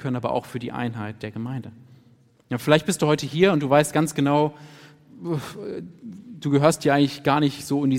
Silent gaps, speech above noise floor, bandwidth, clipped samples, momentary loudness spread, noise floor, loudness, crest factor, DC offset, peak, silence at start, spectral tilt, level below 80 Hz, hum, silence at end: none; 34 dB; 16.5 kHz; under 0.1%; 16 LU; -56 dBFS; -23 LUFS; 22 dB; under 0.1%; -2 dBFS; 0 s; -5.5 dB/octave; -62 dBFS; none; 0 s